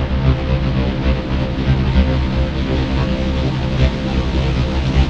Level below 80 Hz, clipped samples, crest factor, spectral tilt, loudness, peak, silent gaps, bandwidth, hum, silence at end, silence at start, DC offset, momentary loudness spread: -20 dBFS; under 0.1%; 14 dB; -7.5 dB/octave; -18 LUFS; -2 dBFS; none; 7.4 kHz; none; 0 s; 0 s; under 0.1%; 3 LU